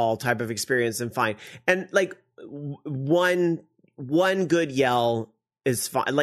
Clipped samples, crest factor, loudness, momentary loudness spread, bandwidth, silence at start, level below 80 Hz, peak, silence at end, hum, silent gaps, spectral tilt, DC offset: under 0.1%; 20 dB; -24 LUFS; 14 LU; 13.5 kHz; 0 s; -66 dBFS; -6 dBFS; 0 s; none; none; -4.5 dB/octave; under 0.1%